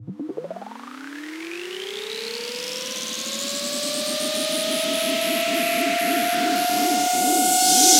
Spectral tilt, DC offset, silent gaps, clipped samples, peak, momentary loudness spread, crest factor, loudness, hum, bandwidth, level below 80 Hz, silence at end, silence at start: -0.5 dB/octave; under 0.1%; none; under 0.1%; -2 dBFS; 16 LU; 20 dB; -22 LUFS; none; 17 kHz; -72 dBFS; 0 s; 0 s